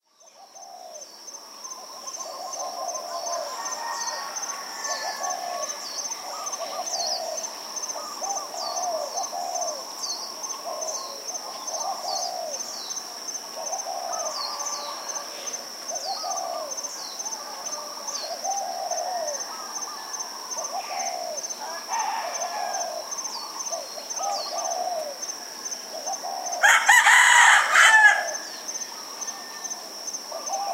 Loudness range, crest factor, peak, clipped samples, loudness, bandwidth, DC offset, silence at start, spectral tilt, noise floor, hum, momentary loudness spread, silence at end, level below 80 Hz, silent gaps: 14 LU; 24 dB; -2 dBFS; under 0.1%; -25 LUFS; 16 kHz; under 0.1%; 0.35 s; 2.5 dB/octave; -52 dBFS; none; 15 LU; 0 s; -88 dBFS; none